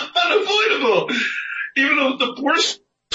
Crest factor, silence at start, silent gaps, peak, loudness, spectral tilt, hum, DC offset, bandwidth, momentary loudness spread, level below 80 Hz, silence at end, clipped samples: 14 dB; 0 s; none; -6 dBFS; -18 LUFS; -2 dB/octave; none; under 0.1%; 8.2 kHz; 6 LU; -76 dBFS; 0.4 s; under 0.1%